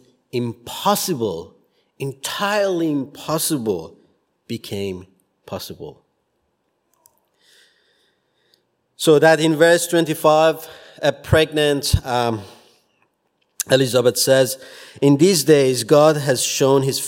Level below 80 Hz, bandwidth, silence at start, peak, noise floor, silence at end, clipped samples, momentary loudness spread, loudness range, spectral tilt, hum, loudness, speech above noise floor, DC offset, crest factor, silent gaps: -42 dBFS; 16.5 kHz; 0.35 s; 0 dBFS; -69 dBFS; 0 s; under 0.1%; 17 LU; 17 LU; -4.5 dB/octave; none; -17 LUFS; 52 dB; under 0.1%; 20 dB; none